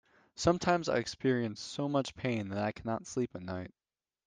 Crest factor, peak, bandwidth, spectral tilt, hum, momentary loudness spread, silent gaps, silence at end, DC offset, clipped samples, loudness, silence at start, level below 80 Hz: 20 dB; -14 dBFS; 10 kHz; -5.5 dB/octave; none; 11 LU; none; 0.6 s; under 0.1%; under 0.1%; -34 LUFS; 0.35 s; -62 dBFS